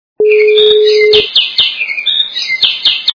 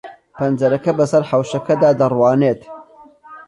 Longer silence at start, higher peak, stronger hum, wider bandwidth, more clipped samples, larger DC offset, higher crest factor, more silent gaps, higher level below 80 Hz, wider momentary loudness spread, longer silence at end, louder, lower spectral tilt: first, 0.2 s vs 0.05 s; first, 0 dBFS vs -4 dBFS; neither; second, 5.4 kHz vs 11 kHz; first, 0.5% vs under 0.1%; neither; about the same, 10 dB vs 14 dB; neither; first, -52 dBFS vs -58 dBFS; about the same, 5 LU vs 6 LU; about the same, 0.05 s vs 0.1 s; first, -8 LUFS vs -16 LUFS; second, -1.5 dB/octave vs -7.5 dB/octave